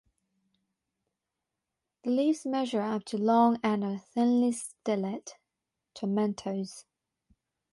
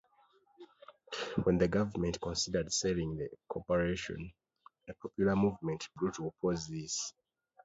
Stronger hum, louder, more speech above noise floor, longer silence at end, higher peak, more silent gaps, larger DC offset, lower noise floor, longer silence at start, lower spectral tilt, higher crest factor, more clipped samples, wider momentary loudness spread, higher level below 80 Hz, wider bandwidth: neither; first, -29 LUFS vs -35 LUFS; first, 59 dB vs 35 dB; first, 0.9 s vs 0.55 s; about the same, -14 dBFS vs -16 dBFS; neither; neither; first, -87 dBFS vs -69 dBFS; first, 2.05 s vs 0.6 s; about the same, -6 dB/octave vs -5 dB/octave; about the same, 18 dB vs 20 dB; neither; about the same, 14 LU vs 14 LU; second, -76 dBFS vs -56 dBFS; first, 11.5 kHz vs 8 kHz